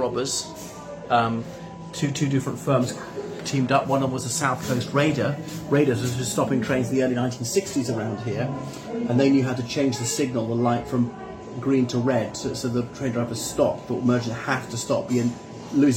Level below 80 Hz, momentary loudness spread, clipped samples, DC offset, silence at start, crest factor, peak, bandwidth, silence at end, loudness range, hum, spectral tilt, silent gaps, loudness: -54 dBFS; 10 LU; under 0.1%; under 0.1%; 0 s; 18 dB; -6 dBFS; 16.5 kHz; 0 s; 2 LU; none; -5.5 dB/octave; none; -24 LUFS